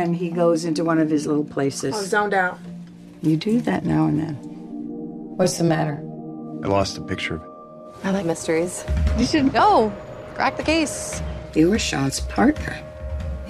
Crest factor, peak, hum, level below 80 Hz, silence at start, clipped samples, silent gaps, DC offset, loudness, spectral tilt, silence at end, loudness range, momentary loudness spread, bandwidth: 16 dB; -6 dBFS; none; -36 dBFS; 0 s; under 0.1%; none; under 0.1%; -22 LUFS; -5.5 dB/octave; 0 s; 4 LU; 15 LU; 14.5 kHz